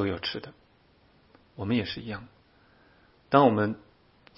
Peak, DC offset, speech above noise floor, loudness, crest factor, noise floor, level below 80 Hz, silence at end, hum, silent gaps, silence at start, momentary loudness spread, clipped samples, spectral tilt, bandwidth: -4 dBFS; under 0.1%; 35 dB; -27 LUFS; 26 dB; -62 dBFS; -62 dBFS; 0.6 s; none; none; 0 s; 19 LU; under 0.1%; -10 dB/octave; 5.8 kHz